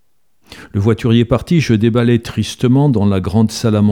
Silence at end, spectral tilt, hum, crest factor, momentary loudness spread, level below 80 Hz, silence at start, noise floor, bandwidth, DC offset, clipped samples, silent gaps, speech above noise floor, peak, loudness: 0 s; -7 dB/octave; none; 12 dB; 5 LU; -40 dBFS; 0.5 s; -57 dBFS; 14 kHz; 0.3%; under 0.1%; none; 44 dB; 0 dBFS; -14 LUFS